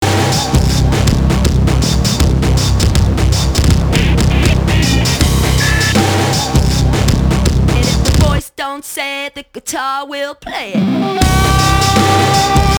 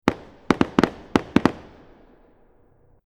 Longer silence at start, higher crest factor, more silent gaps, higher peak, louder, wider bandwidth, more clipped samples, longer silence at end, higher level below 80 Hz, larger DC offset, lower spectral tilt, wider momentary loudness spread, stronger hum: about the same, 0 s vs 0.05 s; second, 12 dB vs 24 dB; neither; about the same, 0 dBFS vs 0 dBFS; first, -13 LUFS vs -22 LUFS; first, over 20 kHz vs 14 kHz; neither; second, 0 s vs 1.45 s; first, -18 dBFS vs -46 dBFS; neither; second, -5 dB/octave vs -6.5 dB/octave; second, 9 LU vs 13 LU; neither